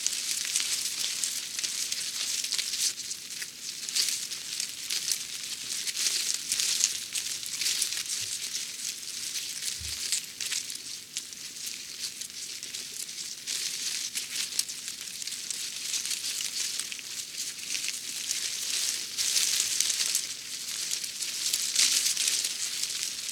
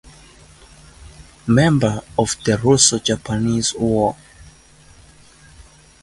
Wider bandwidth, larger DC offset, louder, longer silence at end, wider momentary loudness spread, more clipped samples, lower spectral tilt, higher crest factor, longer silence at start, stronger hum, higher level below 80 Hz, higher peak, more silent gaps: first, 19.5 kHz vs 11.5 kHz; neither; second, -29 LUFS vs -17 LUFS; second, 0 s vs 0.4 s; about the same, 10 LU vs 9 LU; neither; second, 2.5 dB/octave vs -4 dB/octave; first, 30 dB vs 20 dB; second, 0 s vs 1.05 s; neither; second, -68 dBFS vs -44 dBFS; about the same, -2 dBFS vs 0 dBFS; neither